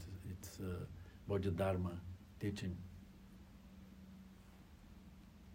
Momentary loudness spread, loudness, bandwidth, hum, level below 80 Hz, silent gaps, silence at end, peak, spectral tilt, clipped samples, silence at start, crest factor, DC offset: 22 LU; -44 LUFS; 16 kHz; none; -64 dBFS; none; 0 s; -26 dBFS; -7 dB/octave; under 0.1%; 0 s; 20 dB; under 0.1%